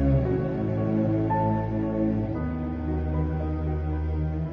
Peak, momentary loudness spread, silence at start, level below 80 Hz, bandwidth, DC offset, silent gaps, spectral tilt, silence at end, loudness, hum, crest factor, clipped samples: -12 dBFS; 5 LU; 0 s; -34 dBFS; 5 kHz; under 0.1%; none; -11.5 dB/octave; 0 s; -27 LUFS; none; 12 dB; under 0.1%